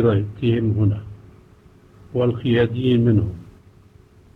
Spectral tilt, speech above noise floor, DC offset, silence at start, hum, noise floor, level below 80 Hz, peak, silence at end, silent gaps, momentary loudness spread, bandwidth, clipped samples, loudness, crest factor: -10 dB/octave; 31 dB; under 0.1%; 0 s; none; -49 dBFS; -46 dBFS; -6 dBFS; 0.85 s; none; 12 LU; 4.1 kHz; under 0.1%; -20 LUFS; 16 dB